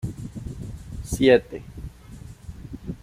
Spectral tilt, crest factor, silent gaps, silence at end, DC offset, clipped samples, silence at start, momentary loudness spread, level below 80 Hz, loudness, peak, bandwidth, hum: -6 dB/octave; 22 dB; none; 0.05 s; under 0.1%; under 0.1%; 0 s; 24 LU; -42 dBFS; -22 LUFS; -4 dBFS; 15.5 kHz; none